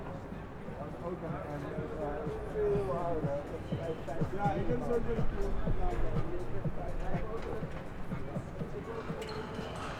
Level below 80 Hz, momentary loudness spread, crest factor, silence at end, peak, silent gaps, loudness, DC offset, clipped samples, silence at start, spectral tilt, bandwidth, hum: -42 dBFS; 9 LU; 16 dB; 0 s; -18 dBFS; none; -37 LUFS; under 0.1%; under 0.1%; 0 s; -7.5 dB/octave; 9.8 kHz; none